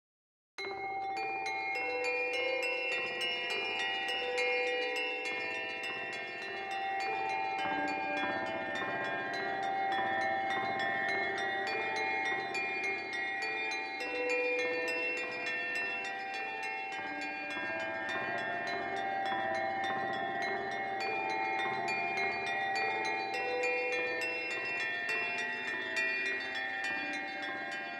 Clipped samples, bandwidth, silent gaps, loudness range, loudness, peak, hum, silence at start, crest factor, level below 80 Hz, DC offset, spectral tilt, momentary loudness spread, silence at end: under 0.1%; 13 kHz; none; 2 LU; -34 LUFS; -22 dBFS; none; 0.6 s; 14 dB; -76 dBFS; under 0.1%; -2.5 dB/octave; 5 LU; 0 s